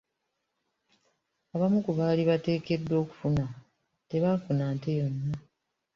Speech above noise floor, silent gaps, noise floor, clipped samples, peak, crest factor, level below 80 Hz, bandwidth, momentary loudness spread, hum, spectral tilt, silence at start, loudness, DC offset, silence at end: 54 dB; none; -82 dBFS; under 0.1%; -14 dBFS; 16 dB; -58 dBFS; 7.2 kHz; 9 LU; none; -9 dB/octave; 1.55 s; -29 LUFS; under 0.1%; 0.55 s